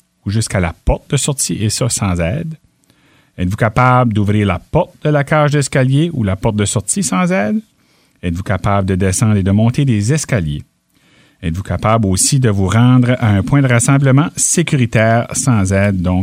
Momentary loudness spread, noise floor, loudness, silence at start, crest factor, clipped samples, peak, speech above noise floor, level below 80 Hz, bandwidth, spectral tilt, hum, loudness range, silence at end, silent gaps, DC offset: 9 LU; -54 dBFS; -14 LUFS; 0.25 s; 14 dB; under 0.1%; 0 dBFS; 41 dB; -34 dBFS; 16 kHz; -5.5 dB/octave; none; 4 LU; 0 s; none; under 0.1%